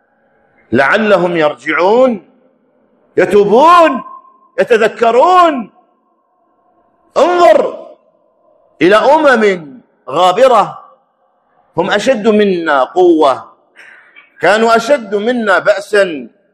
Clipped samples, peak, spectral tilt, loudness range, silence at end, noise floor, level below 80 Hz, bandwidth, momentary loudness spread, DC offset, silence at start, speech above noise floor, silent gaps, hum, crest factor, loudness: 0.8%; 0 dBFS; -5 dB/octave; 3 LU; 0.25 s; -57 dBFS; -56 dBFS; 13 kHz; 12 LU; under 0.1%; 0.7 s; 48 dB; none; none; 12 dB; -10 LUFS